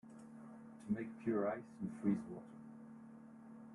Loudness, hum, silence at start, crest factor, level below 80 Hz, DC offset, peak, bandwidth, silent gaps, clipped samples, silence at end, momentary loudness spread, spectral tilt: -42 LUFS; none; 0.05 s; 20 dB; -80 dBFS; under 0.1%; -24 dBFS; 11.5 kHz; none; under 0.1%; 0 s; 18 LU; -9 dB/octave